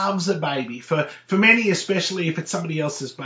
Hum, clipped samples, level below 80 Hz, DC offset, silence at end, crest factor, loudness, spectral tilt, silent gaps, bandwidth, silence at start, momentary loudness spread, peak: none; under 0.1%; -74 dBFS; under 0.1%; 0 s; 20 dB; -21 LUFS; -4.5 dB/octave; none; 8 kHz; 0 s; 11 LU; -2 dBFS